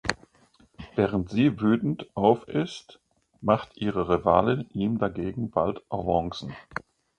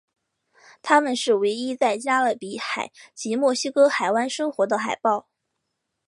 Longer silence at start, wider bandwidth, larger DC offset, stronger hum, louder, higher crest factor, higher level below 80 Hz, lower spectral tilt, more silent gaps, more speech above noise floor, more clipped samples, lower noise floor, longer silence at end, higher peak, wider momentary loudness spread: second, 0.05 s vs 0.85 s; second, 9.8 kHz vs 11.5 kHz; neither; neither; second, -26 LUFS vs -22 LUFS; about the same, 24 dB vs 22 dB; first, -50 dBFS vs -78 dBFS; first, -7 dB/octave vs -3 dB/octave; neither; second, 35 dB vs 57 dB; neither; second, -60 dBFS vs -79 dBFS; second, 0.55 s vs 0.85 s; about the same, -4 dBFS vs -2 dBFS; first, 15 LU vs 10 LU